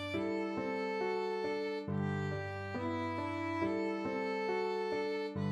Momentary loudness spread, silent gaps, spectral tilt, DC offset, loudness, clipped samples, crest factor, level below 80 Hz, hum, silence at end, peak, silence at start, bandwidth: 3 LU; none; -7 dB/octave; under 0.1%; -37 LUFS; under 0.1%; 14 dB; -72 dBFS; none; 0 s; -24 dBFS; 0 s; 12 kHz